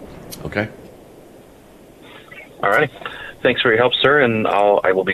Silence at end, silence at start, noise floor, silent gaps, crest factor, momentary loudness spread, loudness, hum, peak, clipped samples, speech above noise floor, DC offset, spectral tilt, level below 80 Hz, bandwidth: 0 s; 0 s; -44 dBFS; none; 16 dB; 20 LU; -17 LUFS; none; -4 dBFS; under 0.1%; 28 dB; under 0.1%; -5 dB/octave; -50 dBFS; 14.5 kHz